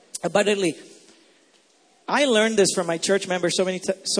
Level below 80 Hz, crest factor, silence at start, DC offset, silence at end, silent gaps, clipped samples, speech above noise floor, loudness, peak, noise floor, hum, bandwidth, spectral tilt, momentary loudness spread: -70 dBFS; 18 dB; 0.15 s; under 0.1%; 0 s; none; under 0.1%; 38 dB; -22 LUFS; -6 dBFS; -59 dBFS; none; 11 kHz; -3 dB/octave; 8 LU